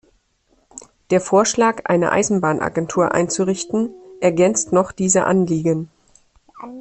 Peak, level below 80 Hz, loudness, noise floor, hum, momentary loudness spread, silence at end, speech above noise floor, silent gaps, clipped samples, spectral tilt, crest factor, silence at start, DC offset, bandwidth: -2 dBFS; -54 dBFS; -18 LUFS; -62 dBFS; none; 7 LU; 0 s; 44 dB; none; under 0.1%; -5 dB/octave; 16 dB; 0.75 s; under 0.1%; 8.8 kHz